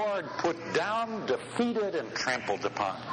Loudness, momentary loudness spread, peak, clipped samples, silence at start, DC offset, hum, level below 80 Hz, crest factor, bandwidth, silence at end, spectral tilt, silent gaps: -31 LUFS; 3 LU; -16 dBFS; under 0.1%; 0 s; under 0.1%; none; -68 dBFS; 14 dB; 10 kHz; 0 s; -4 dB/octave; none